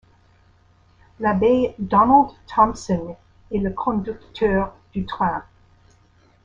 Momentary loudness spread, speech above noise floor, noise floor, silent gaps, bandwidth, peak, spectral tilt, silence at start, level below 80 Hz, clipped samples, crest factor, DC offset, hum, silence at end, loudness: 13 LU; 36 dB; -56 dBFS; none; 7.8 kHz; -2 dBFS; -7 dB/octave; 1.2 s; -44 dBFS; under 0.1%; 20 dB; under 0.1%; none; 1.05 s; -21 LUFS